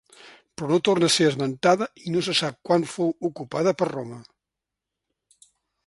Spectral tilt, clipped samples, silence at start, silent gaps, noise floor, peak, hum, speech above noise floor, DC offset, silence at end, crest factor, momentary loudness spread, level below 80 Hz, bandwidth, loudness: -4.5 dB/octave; under 0.1%; 0.25 s; none; -86 dBFS; -6 dBFS; none; 63 dB; under 0.1%; 1.65 s; 20 dB; 15 LU; -66 dBFS; 11.5 kHz; -23 LUFS